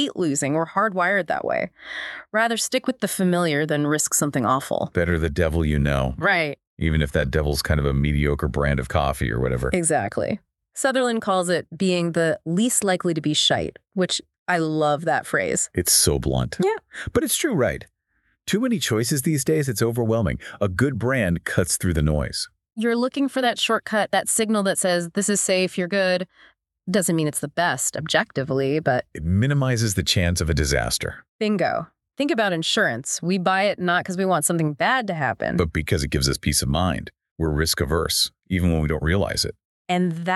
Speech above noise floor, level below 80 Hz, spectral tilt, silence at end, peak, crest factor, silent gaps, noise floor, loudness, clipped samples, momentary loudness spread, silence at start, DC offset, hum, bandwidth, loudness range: 47 dB; -36 dBFS; -4 dB/octave; 0 s; -4 dBFS; 18 dB; 6.67-6.77 s, 14.38-14.46 s, 31.29-31.39 s, 37.31-37.36 s, 39.65-39.85 s; -69 dBFS; -22 LUFS; under 0.1%; 6 LU; 0 s; under 0.1%; none; 12.5 kHz; 2 LU